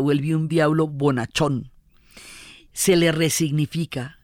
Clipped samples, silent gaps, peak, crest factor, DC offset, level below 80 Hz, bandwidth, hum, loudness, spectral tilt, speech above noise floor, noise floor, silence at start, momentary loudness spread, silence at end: under 0.1%; none; -6 dBFS; 16 dB; under 0.1%; -52 dBFS; 16.5 kHz; none; -21 LUFS; -5 dB/octave; 29 dB; -50 dBFS; 0 s; 21 LU; 0.15 s